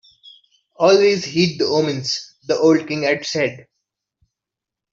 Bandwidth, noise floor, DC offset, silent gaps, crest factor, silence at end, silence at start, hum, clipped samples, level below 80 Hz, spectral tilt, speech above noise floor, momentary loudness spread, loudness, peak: 7.6 kHz; -86 dBFS; under 0.1%; none; 18 dB; 1.3 s; 0.8 s; none; under 0.1%; -62 dBFS; -4.5 dB/octave; 69 dB; 10 LU; -18 LUFS; -2 dBFS